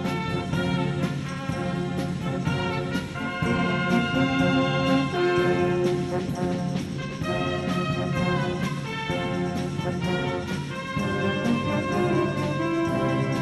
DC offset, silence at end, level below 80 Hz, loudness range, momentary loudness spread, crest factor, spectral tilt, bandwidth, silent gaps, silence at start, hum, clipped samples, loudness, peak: under 0.1%; 0 s; -48 dBFS; 4 LU; 7 LU; 16 dB; -6.5 dB/octave; 12.5 kHz; none; 0 s; none; under 0.1%; -26 LUFS; -10 dBFS